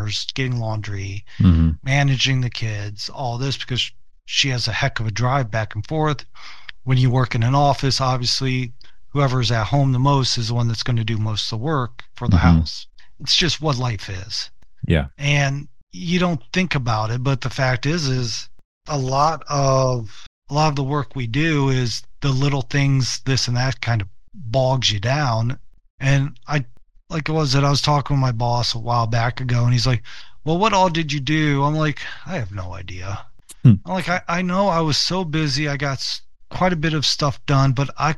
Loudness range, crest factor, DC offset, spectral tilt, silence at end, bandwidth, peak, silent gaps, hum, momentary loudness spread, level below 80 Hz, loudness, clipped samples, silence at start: 2 LU; 20 dB; 2%; -5 dB/octave; 0 s; 11.5 kHz; 0 dBFS; 15.83-15.87 s, 18.65-18.81 s, 20.27-20.42 s, 25.90-25.98 s; none; 12 LU; -36 dBFS; -20 LUFS; under 0.1%; 0 s